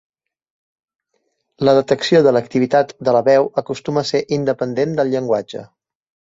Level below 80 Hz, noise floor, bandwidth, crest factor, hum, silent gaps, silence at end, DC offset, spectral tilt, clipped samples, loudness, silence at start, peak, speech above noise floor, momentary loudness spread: -60 dBFS; -69 dBFS; 7.8 kHz; 16 dB; none; none; 0.7 s; under 0.1%; -6 dB/octave; under 0.1%; -17 LUFS; 1.6 s; -2 dBFS; 53 dB; 8 LU